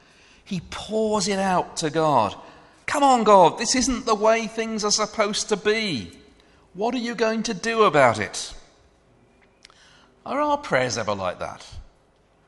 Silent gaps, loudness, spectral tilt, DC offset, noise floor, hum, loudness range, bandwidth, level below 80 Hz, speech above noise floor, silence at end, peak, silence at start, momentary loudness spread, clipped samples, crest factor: none; -22 LUFS; -3.5 dB/octave; under 0.1%; -60 dBFS; none; 8 LU; 11.5 kHz; -52 dBFS; 38 dB; 0.6 s; -2 dBFS; 0.5 s; 16 LU; under 0.1%; 22 dB